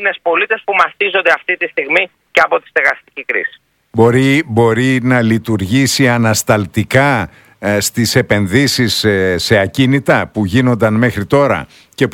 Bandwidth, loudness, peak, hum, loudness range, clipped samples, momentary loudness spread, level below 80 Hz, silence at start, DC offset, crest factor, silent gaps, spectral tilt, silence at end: 17.5 kHz; -13 LUFS; 0 dBFS; none; 1 LU; 0.2%; 6 LU; -44 dBFS; 0 s; under 0.1%; 14 dB; none; -5 dB/octave; 0 s